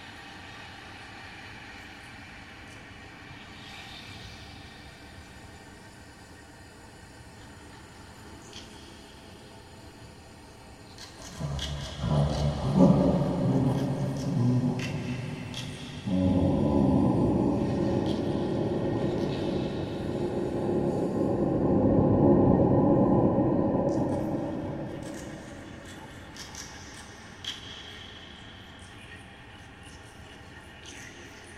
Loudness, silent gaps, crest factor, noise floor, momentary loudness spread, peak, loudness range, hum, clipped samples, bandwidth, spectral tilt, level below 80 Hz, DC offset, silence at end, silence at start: -27 LUFS; none; 22 dB; -49 dBFS; 24 LU; -8 dBFS; 23 LU; none; under 0.1%; 13 kHz; -7.5 dB/octave; -46 dBFS; under 0.1%; 0 s; 0 s